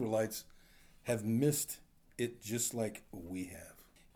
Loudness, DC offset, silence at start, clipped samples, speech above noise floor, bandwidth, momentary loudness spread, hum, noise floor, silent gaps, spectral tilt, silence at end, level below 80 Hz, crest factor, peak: -37 LUFS; under 0.1%; 0 s; under 0.1%; 25 dB; over 20 kHz; 17 LU; none; -61 dBFS; none; -4.5 dB/octave; 0.35 s; -66 dBFS; 18 dB; -20 dBFS